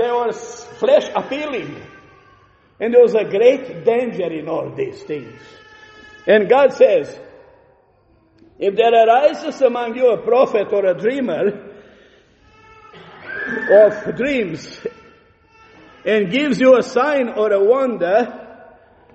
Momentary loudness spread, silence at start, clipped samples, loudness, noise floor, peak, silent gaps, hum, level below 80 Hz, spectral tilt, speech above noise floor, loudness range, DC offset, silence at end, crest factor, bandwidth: 17 LU; 0 s; under 0.1%; -16 LUFS; -55 dBFS; 0 dBFS; none; none; -60 dBFS; -5.5 dB/octave; 40 dB; 3 LU; under 0.1%; 0.6 s; 16 dB; 8.2 kHz